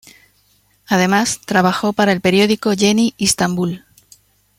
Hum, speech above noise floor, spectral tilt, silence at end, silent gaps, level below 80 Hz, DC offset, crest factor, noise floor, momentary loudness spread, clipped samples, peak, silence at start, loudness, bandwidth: 50 Hz at -35 dBFS; 42 dB; -4 dB/octave; 0.8 s; none; -52 dBFS; under 0.1%; 16 dB; -57 dBFS; 5 LU; under 0.1%; 0 dBFS; 0.9 s; -15 LUFS; 16.5 kHz